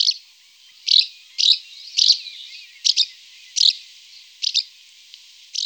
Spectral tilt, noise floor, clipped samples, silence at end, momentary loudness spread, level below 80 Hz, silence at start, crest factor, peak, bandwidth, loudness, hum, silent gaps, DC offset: 9 dB/octave; -50 dBFS; under 0.1%; 0 s; 17 LU; under -90 dBFS; 0 s; 20 dB; -2 dBFS; over 20 kHz; -17 LUFS; none; none; under 0.1%